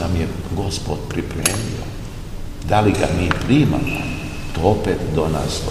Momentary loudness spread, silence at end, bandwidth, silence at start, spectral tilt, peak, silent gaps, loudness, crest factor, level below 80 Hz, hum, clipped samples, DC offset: 14 LU; 0 s; 15.5 kHz; 0 s; -5.5 dB/octave; 0 dBFS; none; -20 LUFS; 20 dB; -30 dBFS; none; under 0.1%; 0.2%